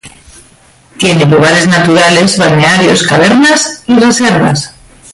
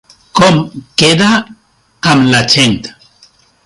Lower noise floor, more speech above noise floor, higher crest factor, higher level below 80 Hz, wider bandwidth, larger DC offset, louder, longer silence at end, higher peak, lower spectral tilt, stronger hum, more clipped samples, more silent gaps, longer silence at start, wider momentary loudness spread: second, -42 dBFS vs -47 dBFS; about the same, 35 dB vs 37 dB; about the same, 8 dB vs 12 dB; about the same, -42 dBFS vs -44 dBFS; about the same, 11.5 kHz vs 11.5 kHz; neither; first, -7 LUFS vs -10 LUFS; second, 0.45 s vs 0.75 s; about the same, 0 dBFS vs 0 dBFS; about the same, -4.5 dB/octave vs -4 dB/octave; neither; neither; neither; second, 0.05 s vs 0.35 s; second, 5 LU vs 9 LU